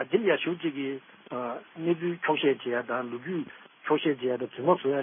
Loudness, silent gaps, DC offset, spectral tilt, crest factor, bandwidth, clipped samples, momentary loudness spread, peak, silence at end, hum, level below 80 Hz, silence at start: -29 LUFS; none; under 0.1%; -10 dB/octave; 18 dB; 3.7 kHz; under 0.1%; 11 LU; -10 dBFS; 0 s; none; -82 dBFS; 0 s